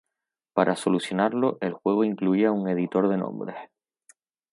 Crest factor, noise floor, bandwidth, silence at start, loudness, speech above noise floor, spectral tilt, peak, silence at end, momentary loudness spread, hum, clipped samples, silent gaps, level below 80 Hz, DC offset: 20 dB; -85 dBFS; 11.5 kHz; 0.55 s; -25 LUFS; 61 dB; -6.5 dB/octave; -6 dBFS; 0.85 s; 9 LU; none; under 0.1%; none; -74 dBFS; under 0.1%